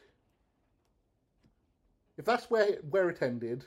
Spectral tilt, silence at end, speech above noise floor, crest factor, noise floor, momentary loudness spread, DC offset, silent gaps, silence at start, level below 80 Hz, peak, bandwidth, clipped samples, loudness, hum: -6 dB/octave; 0 s; 45 dB; 20 dB; -75 dBFS; 6 LU; under 0.1%; none; 2.2 s; -74 dBFS; -14 dBFS; 14.5 kHz; under 0.1%; -31 LUFS; none